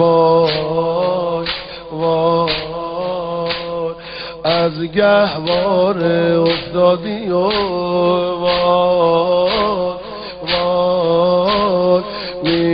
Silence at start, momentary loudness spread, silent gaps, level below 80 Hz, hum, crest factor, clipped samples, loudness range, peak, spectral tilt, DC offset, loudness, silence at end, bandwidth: 0 s; 9 LU; none; -44 dBFS; none; 14 dB; under 0.1%; 4 LU; -2 dBFS; -10 dB/octave; under 0.1%; -16 LUFS; 0 s; 5.6 kHz